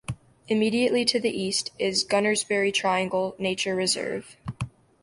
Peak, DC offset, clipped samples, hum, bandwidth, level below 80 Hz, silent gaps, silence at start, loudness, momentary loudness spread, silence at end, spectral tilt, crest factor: -8 dBFS; under 0.1%; under 0.1%; none; 11.5 kHz; -56 dBFS; none; 0.1 s; -25 LUFS; 14 LU; 0.35 s; -3.5 dB/octave; 18 dB